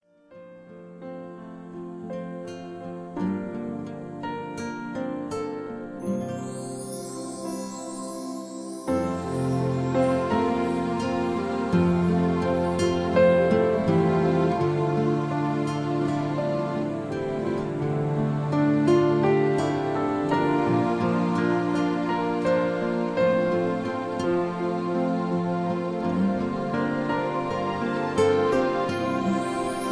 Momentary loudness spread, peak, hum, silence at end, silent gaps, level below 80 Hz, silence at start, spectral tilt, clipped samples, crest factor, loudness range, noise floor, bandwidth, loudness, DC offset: 13 LU; -8 dBFS; none; 0 s; none; -56 dBFS; 0.3 s; -7 dB/octave; under 0.1%; 18 dB; 10 LU; -49 dBFS; 11 kHz; -25 LUFS; under 0.1%